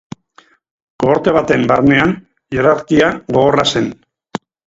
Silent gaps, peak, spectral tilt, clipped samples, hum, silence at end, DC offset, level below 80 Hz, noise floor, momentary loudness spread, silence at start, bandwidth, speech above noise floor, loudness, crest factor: none; 0 dBFS; -5.5 dB/octave; under 0.1%; none; 0.75 s; under 0.1%; -44 dBFS; -50 dBFS; 14 LU; 1 s; 8 kHz; 37 dB; -13 LUFS; 14 dB